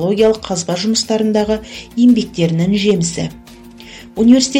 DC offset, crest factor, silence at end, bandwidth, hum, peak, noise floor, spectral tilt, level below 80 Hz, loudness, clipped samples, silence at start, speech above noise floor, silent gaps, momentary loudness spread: under 0.1%; 14 dB; 0 s; 13 kHz; none; 0 dBFS; -37 dBFS; -5 dB/octave; -42 dBFS; -15 LUFS; under 0.1%; 0 s; 23 dB; none; 14 LU